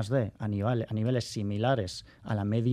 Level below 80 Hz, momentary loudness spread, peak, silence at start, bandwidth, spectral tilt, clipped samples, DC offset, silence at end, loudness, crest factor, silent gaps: -60 dBFS; 6 LU; -12 dBFS; 0 s; 11.5 kHz; -7 dB/octave; under 0.1%; under 0.1%; 0 s; -31 LUFS; 16 dB; none